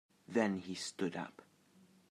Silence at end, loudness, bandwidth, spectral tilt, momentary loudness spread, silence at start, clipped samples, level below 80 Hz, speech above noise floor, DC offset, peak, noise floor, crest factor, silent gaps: 0.7 s; -39 LUFS; 14 kHz; -5 dB/octave; 10 LU; 0.3 s; under 0.1%; -88 dBFS; 29 dB; under 0.1%; -20 dBFS; -67 dBFS; 22 dB; none